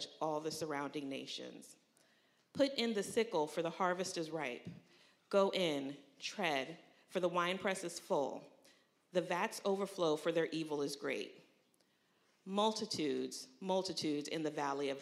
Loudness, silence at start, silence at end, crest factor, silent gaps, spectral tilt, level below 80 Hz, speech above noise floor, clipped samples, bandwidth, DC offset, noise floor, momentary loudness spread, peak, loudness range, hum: -38 LUFS; 0 s; 0 s; 20 dB; none; -4 dB/octave; -88 dBFS; 37 dB; under 0.1%; 15.5 kHz; under 0.1%; -75 dBFS; 11 LU; -20 dBFS; 2 LU; none